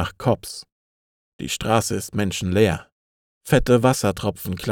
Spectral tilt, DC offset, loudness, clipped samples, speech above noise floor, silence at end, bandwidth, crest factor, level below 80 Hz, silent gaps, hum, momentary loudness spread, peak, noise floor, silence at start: -5 dB/octave; under 0.1%; -21 LUFS; under 0.1%; over 69 dB; 0 s; 19.5 kHz; 18 dB; -40 dBFS; 0.72-1.39 s, 2.92-3.41 s; none; 15 LU; -4 dBFS; under -90 dBFS; 0 s